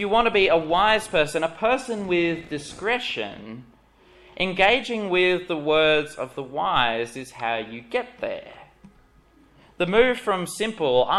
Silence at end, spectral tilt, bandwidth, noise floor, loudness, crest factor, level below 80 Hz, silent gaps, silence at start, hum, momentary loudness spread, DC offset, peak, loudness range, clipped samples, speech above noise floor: 0 s; -4 dB/octave; 13 kHz; -56 dBFS; -23 LUFS; 20 dB; -50 dBFS; none; 0 s; none; 13 LU; under 0.1%; -4 dBFS; 6 LU; under 0.1%; 33 dB